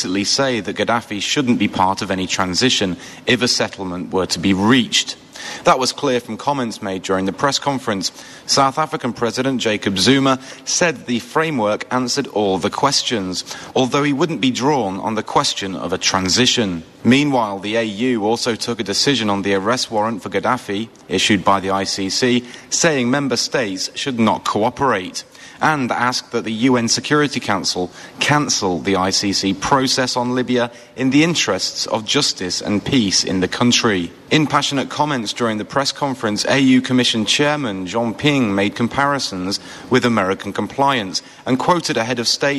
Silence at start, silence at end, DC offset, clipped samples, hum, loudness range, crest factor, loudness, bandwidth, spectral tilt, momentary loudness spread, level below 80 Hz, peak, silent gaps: 0 s; 0 s; under 0.1%; under 0.1%; none; 2 LU; 16 dB; -17 LUFS; 13 kHz; -3.5 dB/octave; 7 LU; -54 dBFS; -2 dBFS; none